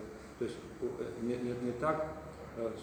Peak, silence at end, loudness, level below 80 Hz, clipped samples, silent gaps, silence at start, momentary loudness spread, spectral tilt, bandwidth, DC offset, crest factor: -20 dBFS; 0 s; -38 LUFS; -60 dBFS; under 0.1%; none; 0 s; 10 LU; -6.5 dB/octave; over 20 kHz; under 0.1%; 20 dB